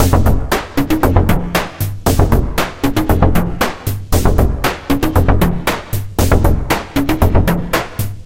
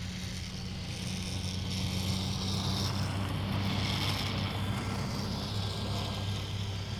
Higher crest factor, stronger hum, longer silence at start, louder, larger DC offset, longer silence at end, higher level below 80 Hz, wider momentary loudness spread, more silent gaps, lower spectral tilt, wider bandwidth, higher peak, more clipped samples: about the same, 14 dB vs 16 dB; neither; about the same, 0 s vs 0 s; first, -15 LUFS vs -34 LUFS; neither; about the same, 0 s vs 0 s; first, -20 dBFS vs -46 dBFS; about the same, 6 LU vs 6 LU; neither; first, -6 dB/octave vs -4.5 dB/octave; about the same, 17 kHz vs 17 kHz; first, 0 dBFS vs -18 dBFS; neither